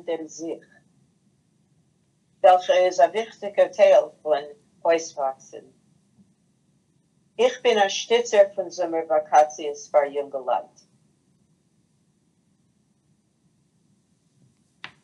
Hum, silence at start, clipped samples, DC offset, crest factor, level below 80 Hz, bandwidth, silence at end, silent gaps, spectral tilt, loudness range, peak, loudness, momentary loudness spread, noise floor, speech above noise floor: none; 0.05 s; under 0.1%; under 0.1%; 20 dB; -82 dBFS; 9.4 kHz; 4.4 s; none; -2 dB/octave; 9 LU; -4 dBFS; -22 LUFS; 17 LU; -66 dBFS; 45 dB